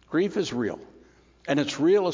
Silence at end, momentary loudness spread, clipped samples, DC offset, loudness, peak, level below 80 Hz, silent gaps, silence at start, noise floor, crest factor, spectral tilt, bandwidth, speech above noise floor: 0 s; 16 LU; under 0.1%; under 0.1%; -26 LUFS; -10 dBFS; -62 dBFS; none; 0.1 s; -56 dBFS; 16 dB; -5.5 dB/octave; 7.6 kHz; 31 dB